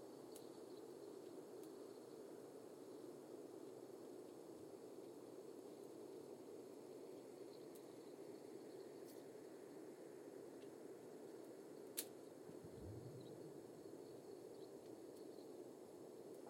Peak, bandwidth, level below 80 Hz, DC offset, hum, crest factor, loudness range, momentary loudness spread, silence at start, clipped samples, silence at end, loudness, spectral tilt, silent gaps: -28 dBFS; 16.5 kHz; -86 dBFS; under 0.1%; none; 30 dB; 2 LU; 2 LU; 0 s; under 0.1%; 0 s; -57 LUFS; -5 dB/octave; none